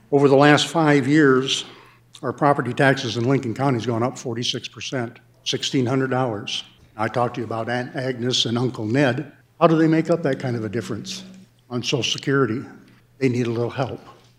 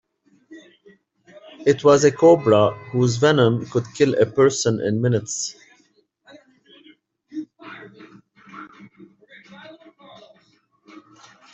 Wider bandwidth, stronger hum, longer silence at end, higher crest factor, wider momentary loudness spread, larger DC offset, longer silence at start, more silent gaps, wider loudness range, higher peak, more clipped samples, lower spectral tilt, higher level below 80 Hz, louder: first, 13 kHz vs 8.2 kHz; neither; second, 0.25 s vs 0.55 s; about the same, 20 dB vs 20 dB; second, 14 LU vs 25 LU; neither; second, 0.1 s vs 0.5 s; neither; second, 5 LU vs 24 LU; about the same, 0 dBFS vs -2 dBFS; neither; about the same, -5 dB/octave vs -5.5 dB/octave; second, -66 dBFS vs -60 dBFS; second, -21 LUFS vs -18 LUFS